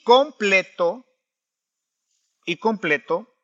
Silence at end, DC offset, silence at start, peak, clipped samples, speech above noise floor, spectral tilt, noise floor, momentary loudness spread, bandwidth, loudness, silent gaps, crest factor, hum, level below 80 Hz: 0.2 s; under 0.1%; 0.05 s; -2 dBFS; under 0.1%; 65 dB; -4 dB/octave; -85 dBFS; 13 LU; 7.8 kHz; -21 LUFS; none; 20 dB; none; -80 dBFS